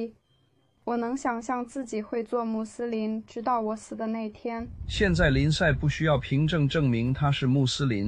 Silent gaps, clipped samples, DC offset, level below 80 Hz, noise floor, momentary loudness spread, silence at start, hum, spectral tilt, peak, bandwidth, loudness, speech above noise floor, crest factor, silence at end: none; under 0.1%; under 0.1%; -42 dBFS; -67 dBFS; 11 LU; 0 s; none; -6 dB/octave; -10 dBFS; 9.8 kHz; -27 LUFS; 40 dB; 16 dB; 0 s